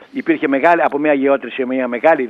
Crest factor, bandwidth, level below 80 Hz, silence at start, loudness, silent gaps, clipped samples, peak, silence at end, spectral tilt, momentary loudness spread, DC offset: 14 dB; 6.6 kHz; -68 dBFS; 0 s; -16 LUFS; none; under 0.1%; -2 dBFS; 0 s; -7 dB/octave; 6 LU; under 0.1%